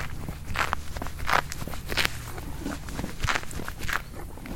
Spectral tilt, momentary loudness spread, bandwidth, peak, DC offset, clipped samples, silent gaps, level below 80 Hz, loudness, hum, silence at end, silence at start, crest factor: -3.5 dB/octave; 11 LU; 17 kHz; 0 dBFS; under 0.1%; under 0.1%; none; -38 dBFS; -30 LUFS; none; 0 s; 0 s; 30 dB